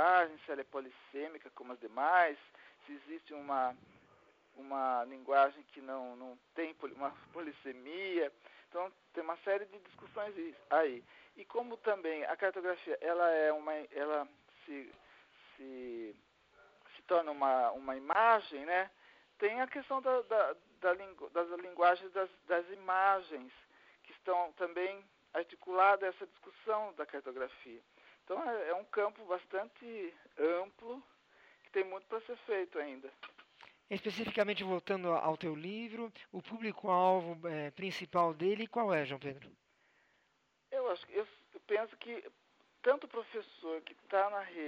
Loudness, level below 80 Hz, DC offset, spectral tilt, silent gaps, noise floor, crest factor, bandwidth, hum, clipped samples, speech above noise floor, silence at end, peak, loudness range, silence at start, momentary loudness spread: -36 LUFS; -84 dBFS; under 0.1%; -6 dB/octave; none; -77 dBFS; 22 dB; 7.4 kHz; none; under 0.1%; 40 dB; 0 s; -16 dBFS; 7 LU; 0 s; 18 LU